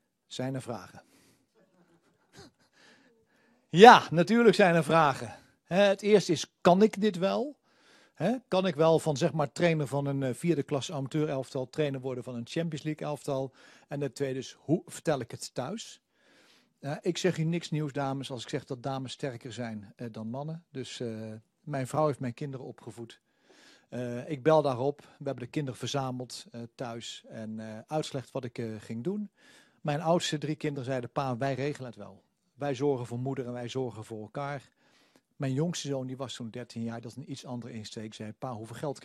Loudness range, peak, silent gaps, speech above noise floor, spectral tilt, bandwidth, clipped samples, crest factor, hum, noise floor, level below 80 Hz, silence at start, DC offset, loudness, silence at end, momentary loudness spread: 14 LU; 0 dBFS; none; 38 dB; -5.5 dB/octave; 13 kHz; under 0.1%; 30 dB; none; -68 dBFS; -72 dBFS; 0.3 s; under 0.1%; -29 LUFS; 0 s; 17 LU